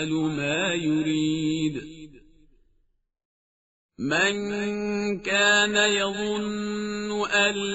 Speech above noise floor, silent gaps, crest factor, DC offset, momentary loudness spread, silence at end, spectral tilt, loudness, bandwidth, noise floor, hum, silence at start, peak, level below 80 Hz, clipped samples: 44 dB; 3.25-3.89 s; 18 dB; under 0.1%; 10 LU; 0 s; -2.5 dB/octave; -24 LUFS; 8 kHz; -68 dBFS; none; 0 s; -8 dBFS; -56 dBFS; under 0.1%